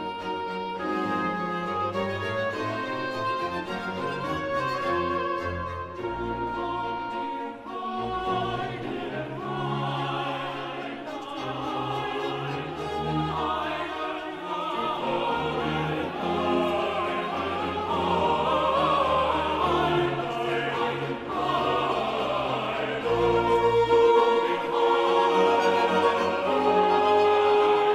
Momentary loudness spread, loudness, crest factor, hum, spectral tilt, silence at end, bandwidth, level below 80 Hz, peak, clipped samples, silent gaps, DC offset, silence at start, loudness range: 11 LU; -26 LUFS; 16 dB; none; -6 dB/octave; 0 s; 14 kHz; -52 dBFS; -10 dBFS; under 0.1%; none; under 0.1%; 0 s; 9 LU